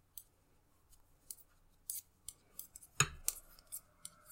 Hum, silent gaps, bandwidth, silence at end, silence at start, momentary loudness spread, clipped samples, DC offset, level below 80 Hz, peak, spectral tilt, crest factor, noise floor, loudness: none; none; 16.5 kHz; 0 s; 0.15 s; 20 LU; under 0.1%; under 0.1%; -64 dBFS; -12 dBFS; -1.5 dB/octave; 36 dB; -71 dBFS; -41 LUFS